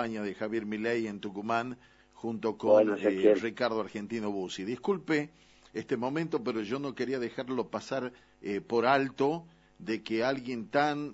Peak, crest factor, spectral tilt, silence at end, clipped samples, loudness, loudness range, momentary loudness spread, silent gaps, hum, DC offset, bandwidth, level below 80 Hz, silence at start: -10 dBFS; 20 dB; -6 dB/octave; 0 s; under 0.1%; -31 LUFS; 5 LU; 13 LU; none; none; under 0.1%; 8 kHz; -70 dBFS; 0 s